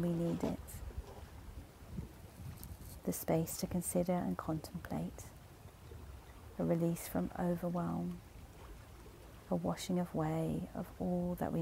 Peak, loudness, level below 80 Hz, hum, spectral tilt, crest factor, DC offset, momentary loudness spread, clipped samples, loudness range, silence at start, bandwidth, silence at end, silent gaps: -22 dBFS; -39 LUFS; -56 dBFS; none; -6.5 dB/octave; 18 dB; under 0.1%; 19 LU; under 0.1%; 3 LU; 0 s; 16 kHz; 0 s; none